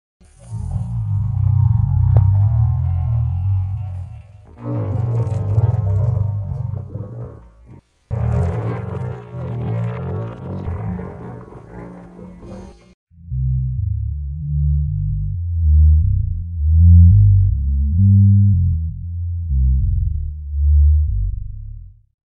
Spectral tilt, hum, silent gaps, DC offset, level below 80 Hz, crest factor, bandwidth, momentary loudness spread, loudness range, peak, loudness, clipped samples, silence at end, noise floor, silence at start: -11 dB/octave; none; 12.94-13.07 s; under 0.1%; -22 dBFS; 16 dB; 2.7 kHz; 20 LU; 13 LU; 0 dBFS; -18 LUFS; under 0.1%; 0.5 s; -45 dBFS; 0.45 s